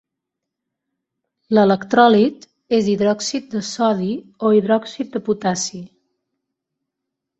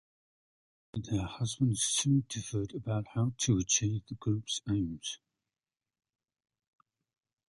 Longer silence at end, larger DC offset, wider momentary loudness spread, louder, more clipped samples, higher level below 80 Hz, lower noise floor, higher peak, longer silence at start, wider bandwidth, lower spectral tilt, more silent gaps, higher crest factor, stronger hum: second, 1.55 s vs 2.3 s; neither; about the same, 12 LU vs 11 LU; first, -18 LUFS vs -32 LUFS; neither; second, -62 dBFS vs -56 dBFS; second, -81 dBFS vs under -90 dBFS; first, -2 dBFS vs -16 dBFS; first, 1.5 s vs 0.95 s; second, 8.2 kHz vs 11.5 kHz; about the same, -5 dB/octave vs -4.5 dB/octave; neither; about the same, 18 dB vs 18 dB; neither